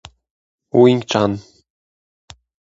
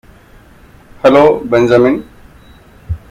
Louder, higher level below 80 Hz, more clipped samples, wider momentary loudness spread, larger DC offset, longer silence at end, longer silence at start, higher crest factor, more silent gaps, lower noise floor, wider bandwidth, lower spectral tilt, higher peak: second, -16 LUFS vs -10 LUFS; second, -54 dBFS vs -38 dBFS; second, under 0.1% vs 0.2%; second, 9 LU vs 16 LU; neither; first, 1.3 s vs 0.15 s; second, 0.75 s vs 1.05 s; first, 20 dB vs 14 dB; neither; first, under -90 dBFS vs -41 dBFS; second, 7.8 kHz vs 11.5 kHz; about the same, -6.5 dB/octave vs -7 dB/octave; about the same, 0 dBFS vs 0 dBFS